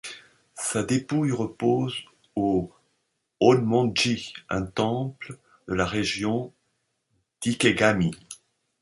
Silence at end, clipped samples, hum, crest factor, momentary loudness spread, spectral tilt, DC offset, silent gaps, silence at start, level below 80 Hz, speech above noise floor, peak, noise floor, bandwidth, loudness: 0.45 s; under 0.1%; none; 22 dB; 21 LU; -5 dB/octave; under 0.1%; none; 0.05 s; -52 dBFS; 51 dB; -4 dBFS; -75 dBFS; 11.5 kHz; -25 LUFS